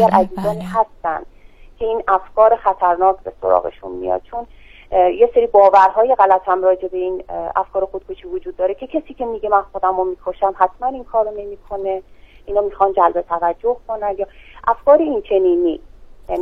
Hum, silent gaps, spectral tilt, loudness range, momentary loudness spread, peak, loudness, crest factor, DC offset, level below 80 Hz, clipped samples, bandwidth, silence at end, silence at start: none; none; -7.5 dB/octave; 6 LU; 13 LU; 0 dBFS; -17 LUFS; 16 dB; 0.1%; -44 dBFS; under 0.1%; 11 kHz; 0 s; 0 s